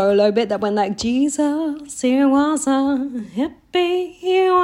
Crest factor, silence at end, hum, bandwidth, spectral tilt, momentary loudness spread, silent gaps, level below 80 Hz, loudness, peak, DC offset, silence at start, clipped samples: 14 dB; 0 s; none; 12 kHz; -4.5 dB/octave; 9 LU; none; -54 dBFS; -19 LUFS; -4 dBFS; under 0.1%; 0 s; under 0.1%